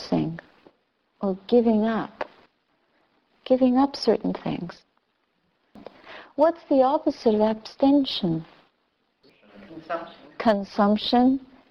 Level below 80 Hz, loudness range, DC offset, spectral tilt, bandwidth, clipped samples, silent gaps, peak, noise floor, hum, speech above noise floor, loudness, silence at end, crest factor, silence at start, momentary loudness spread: -60 dBFS; 3 LU; under 0.1%; -7 dB/octave; 7 kHz; under 0.1%; none; -6 dBFS; -71 dBFS; none; 49 dB; -23 LUFS; 0.25 s; 18 dB; 0 s; 17 LU